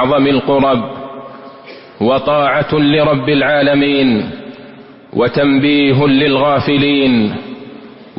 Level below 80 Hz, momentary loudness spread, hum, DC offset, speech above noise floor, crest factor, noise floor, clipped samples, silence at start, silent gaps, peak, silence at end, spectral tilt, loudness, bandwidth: -44 dBFS; 19 LU; none; under 0.1%; 25 dB; 12 dB; -36 dBFS; under 0.1%; 0 s; none; -2 dBFS; 0.1 s; -11.5 dB/octave; -12 LUFS; 5.6 kHz